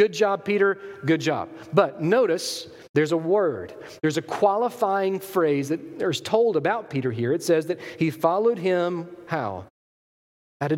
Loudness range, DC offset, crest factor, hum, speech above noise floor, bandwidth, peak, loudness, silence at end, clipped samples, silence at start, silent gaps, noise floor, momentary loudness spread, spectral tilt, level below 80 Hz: 2 LU; under 0.1%; 20 dB; none; over 67 dB; 16.5 kHz; -4 dBFS; -24 LUFS; 0 s; under 0.1%; 0 s; 2.89-2.94 s, 9.70-10.60 s; under -90 dBFS; 9 LU; -5.5 dB/octave; -70 dBFS